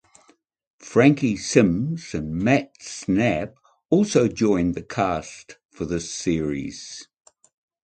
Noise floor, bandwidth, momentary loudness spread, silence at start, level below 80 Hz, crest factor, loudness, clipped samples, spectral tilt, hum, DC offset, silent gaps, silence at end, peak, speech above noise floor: -60 dBFS; 9.2 kHz; 17 LU; 0.8 s; -48 dBFS; 22 dB; -22 LUFS; under 0.1%; -5.5 dB/octave; none; under 0.1%; 5.65-5.69 s; 0.8 s; -2 dBFS; 38 dB